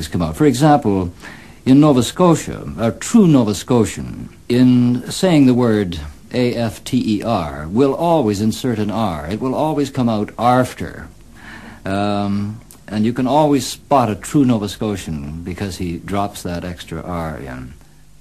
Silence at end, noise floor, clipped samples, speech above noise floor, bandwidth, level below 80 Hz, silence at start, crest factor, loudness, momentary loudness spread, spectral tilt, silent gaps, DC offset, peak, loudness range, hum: 0.45 s; -37 dBFS; under 0.1%; 21 dB; 13 kHz; -40 dBFS; 0 s; 16 dB; -17 LUFS; 16 LU; -6.5 dB/octave; none; 0.4%; 0 dBFS; 6 LU; none